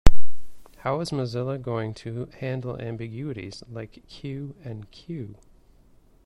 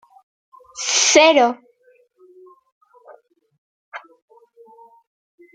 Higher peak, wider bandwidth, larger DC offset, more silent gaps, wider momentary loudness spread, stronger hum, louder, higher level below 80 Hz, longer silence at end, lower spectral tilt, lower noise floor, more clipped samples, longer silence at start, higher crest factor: about the same, 0 dBFS vs -2 dBFS; about the same, 10.5 kHz vs 10 kHz; neither; second, none vs 2.72-2.81 s, 3.58-3.92 s; second, 12 LU vs 27 LU; neither; second, -32 LUFS vs -14 LUFS; first, -32 dBFS vs -70 dBFS; second, 0 s vs 1.55 s; first, -6.5 dB/octave vs 0.5 dB/octave; about the same, -55 dBFS vs -57 dBFS; first, 0.2% vs under 0.1%; second, 0.05 s vs 0.75 s; about the same, 20 dB vs 20 dB